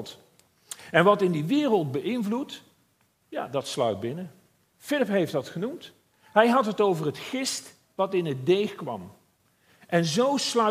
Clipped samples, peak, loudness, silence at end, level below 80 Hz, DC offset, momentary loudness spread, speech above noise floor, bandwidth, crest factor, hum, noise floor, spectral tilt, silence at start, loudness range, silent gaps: under 0.1%; -4 dBFS; -26 LUFS; 0 s; -74 dBFS; under 0.1%; 17 LU; 43 dB; 15.5 kHz; 24 dB; none; -68 dBFS; -5 dB/octave; 0 s; 5 LU; none